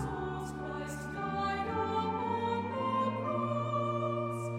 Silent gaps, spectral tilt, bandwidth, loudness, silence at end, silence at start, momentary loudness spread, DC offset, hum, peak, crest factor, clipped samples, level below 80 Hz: none; -6.5 dB/octave; 16 kHz; -34 LUFS; 0 s; 0 s; 6 LU; under 0.1%; none; -20 dBFS; 14 dB; under 0.1%; -56 dBFS